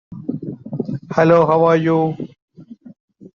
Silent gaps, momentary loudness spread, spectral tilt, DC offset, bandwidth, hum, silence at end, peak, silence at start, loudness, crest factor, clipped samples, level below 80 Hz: 2.42-2.48 s, 3.00-3.08 s; 17 LU; -7 dB/octave; under 0.1%; 7 kHz; none; 0.1 s; -2 dBFS; 0.1 s; -16 LUFS; 16 dB; under 0.1%; -58 dBFS